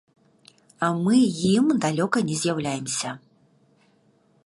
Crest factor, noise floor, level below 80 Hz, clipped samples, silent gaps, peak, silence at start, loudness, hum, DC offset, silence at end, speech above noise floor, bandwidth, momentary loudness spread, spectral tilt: 16 dB; -62 dBFS; -64 dBFS; under 0.1%; none; -8 dBFS; 0.8 s; -23 LUFS; none; under 0.1%; 1.3 s; 40 dB; 11.5 kHz; 8 LU; -5 dB/octave